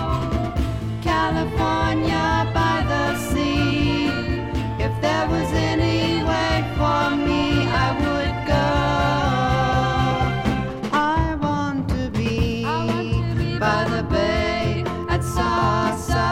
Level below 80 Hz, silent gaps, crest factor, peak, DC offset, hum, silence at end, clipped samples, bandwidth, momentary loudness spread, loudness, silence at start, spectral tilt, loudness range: -30 dBFS; none; 14 dB; -6 dBFS; under 0.1%; none; 0 s; under 0.1%; 15.5 kHz; 4 LU; -21 LUFS; 0 s; -6 dB/octave; 2 LU